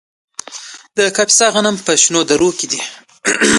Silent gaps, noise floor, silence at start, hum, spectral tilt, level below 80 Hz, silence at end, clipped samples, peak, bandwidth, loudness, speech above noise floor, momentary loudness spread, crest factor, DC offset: none; -33 dBFS; 0.5 s; none; -1.5 dB/octave; -52 dBFS; 0 s; under 0.1%; 0 dBFS; 11.5 kHz; -13 LUFS; 20 dB; 20 LU; 16 dB; under 0.1%